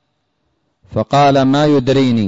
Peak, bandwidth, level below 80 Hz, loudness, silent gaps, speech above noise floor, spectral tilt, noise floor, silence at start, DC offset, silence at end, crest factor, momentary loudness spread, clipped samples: -4 dBFS; 7.8 kHz; -46 dBFS; -13 LUFS; none; 55 dB; -7 dB/octave; -66 dBFS; 0.9 s; under 0.1%; 0 s; 10 dB; 10 LU; under 0.1%